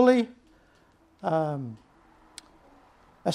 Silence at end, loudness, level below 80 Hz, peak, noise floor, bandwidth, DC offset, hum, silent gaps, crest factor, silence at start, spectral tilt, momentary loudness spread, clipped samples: 0 s; -28 LUFS; -68 dBFS; -8 dBFS; -61 dBFS; 11.5 kHz; under 0.1%; none; none; 20 dB; 0 s; -6.5 dB/octave; 23 LU; under 0.1%